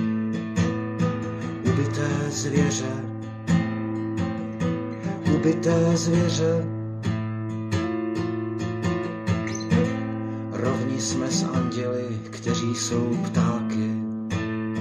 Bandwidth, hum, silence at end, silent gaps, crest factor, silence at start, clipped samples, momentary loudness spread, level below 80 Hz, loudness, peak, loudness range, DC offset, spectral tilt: 10.5 kHz; none; 0 s; none; 18 dB; 0 s; under 0.1%; 8 LU; -60 dBFS; -25 LUFS; -8 dBFS; 3 LU; under 0.1%; -6 dB/octave